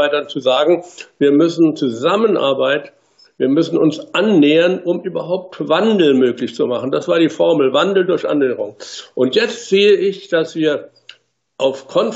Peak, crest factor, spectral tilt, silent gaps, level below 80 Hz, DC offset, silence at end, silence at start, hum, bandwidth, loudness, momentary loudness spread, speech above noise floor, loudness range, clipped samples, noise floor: -2 dBFS; 12 dB; -5.5 dB/octave; none; -70 dBFS; under 0.1%; 0 s; 0 s; none; 8 kHz; -15 LUFS; 9 LU; 30 dB; 2 LU; under 0.1%; -45 dBFS